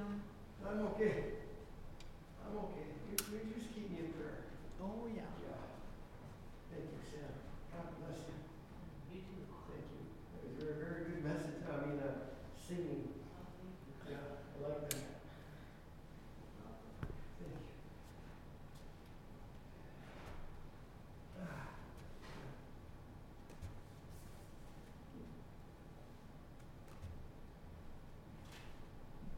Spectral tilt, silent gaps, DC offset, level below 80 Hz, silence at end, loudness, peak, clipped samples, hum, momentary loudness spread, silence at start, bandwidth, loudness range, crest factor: -5.5 dB/octave; none; under 0.1%; -58 dBFS; 0 s; -50 LUFS; -20 dBFS; under 0.1%; none; 15 LU; 0 s; 16.5 kHz; 12 LU; 30 dB